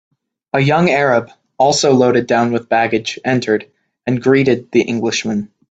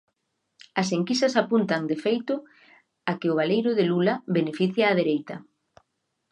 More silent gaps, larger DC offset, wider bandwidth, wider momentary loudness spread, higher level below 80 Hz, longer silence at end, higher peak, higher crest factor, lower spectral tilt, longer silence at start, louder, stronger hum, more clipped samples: neither; neither; second, 9 kHz vs 10.5 kHz; about the same, 8 LU vs 10 LU; first, -54 dBFS vs -76 dBFS; second, 0.3 s vs 0.9 s; first, 0 dBFS vs -6 dBFS; second, 14 dB vs 20 dB; about the same, -5 dB/octave vs -6 dB/octave; second, 0.55 s vs 0.75 s; first, -15 LUFS vs -25 LUFS; neither; neither